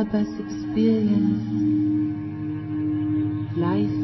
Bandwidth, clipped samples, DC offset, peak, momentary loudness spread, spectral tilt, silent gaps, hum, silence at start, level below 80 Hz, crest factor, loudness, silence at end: 6 kHz; under 0.1%; under 0.1%; -10 dBFS; 9 LU; -9 dB/octave; none; none; 0 s; -50 dBFS; 12 dB; -24 LUFS; 0 s